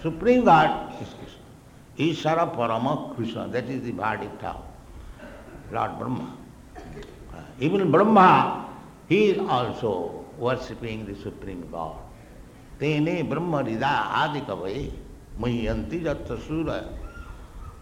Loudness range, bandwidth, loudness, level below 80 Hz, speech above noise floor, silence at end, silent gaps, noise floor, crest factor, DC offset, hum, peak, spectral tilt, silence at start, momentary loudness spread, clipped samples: 11 LU; 16 kHz; -24 LUFS; -44 dBFS; 24 dB; 0 s; none; -48 dBFS; 20 dB; under 0.1%; none; -6 dBFS; -7 dB/octave; 0 s; 24 LU; under 0.1%